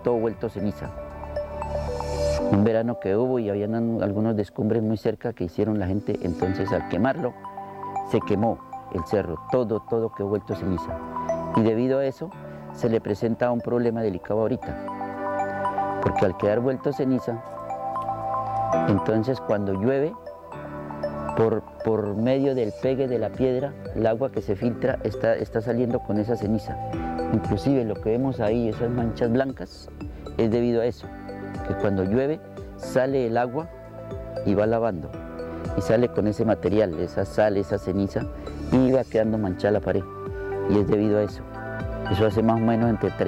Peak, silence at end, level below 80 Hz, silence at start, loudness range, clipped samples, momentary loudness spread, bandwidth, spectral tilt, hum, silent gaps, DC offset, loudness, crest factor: -6 dBFS; 0 s; -44 dBFS; 0 s; 3 LU; under 0.1%; 12 LU; 15.5 kHz; -8 dB/octave; none; none; under 0.1%; -25 LUFS; 18 dB